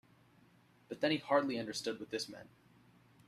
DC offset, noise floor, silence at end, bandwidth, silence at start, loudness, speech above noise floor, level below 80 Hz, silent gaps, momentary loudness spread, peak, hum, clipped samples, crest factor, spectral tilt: under 0.1%; -67 dBFS; 0.8 s; 14 kHz; 0.9 s; -37 LUFS; 30 dB; -80 dBFS; none; 15 LU; -16 dBFS; none; under 0.1%; 22 dB; -4 dB/octave